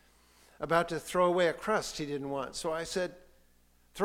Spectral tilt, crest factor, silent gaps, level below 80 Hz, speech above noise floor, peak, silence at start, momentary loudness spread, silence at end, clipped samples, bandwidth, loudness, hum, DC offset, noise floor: -4.5 dB/octave; 22 dB; none; -60 dBFS; 33 dB; -12 dBFS; 0.6 s; 10 LU; 0 s; under 0.1%; 16.5 kHz; -32 LUFS; 60 Hz at -60 dBFS; under 0.1%; -65 dBFS